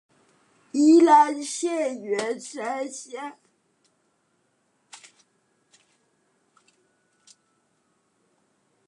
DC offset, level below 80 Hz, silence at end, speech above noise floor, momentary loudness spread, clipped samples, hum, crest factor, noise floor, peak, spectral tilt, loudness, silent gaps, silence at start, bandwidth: under 0.1%; -88 dBFS; 5.55 s; 46 dB; 20 LU; under 0.1%; none; 22 dB; -70 dBFS; -6 dBFS; -3 dB/octave; -22 LUFS; none; 0.75 s; 11.5 kHz